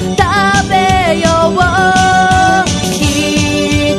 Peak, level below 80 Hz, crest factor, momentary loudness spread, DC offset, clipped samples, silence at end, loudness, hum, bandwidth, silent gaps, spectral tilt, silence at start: 0 dBFS; -26 dBFS; 10 dB; 3 LU; under 0.1%; under 0.1%; 0 s; -10 LUFS; none; 13 kHz; none; -4 dB/octave; 0 s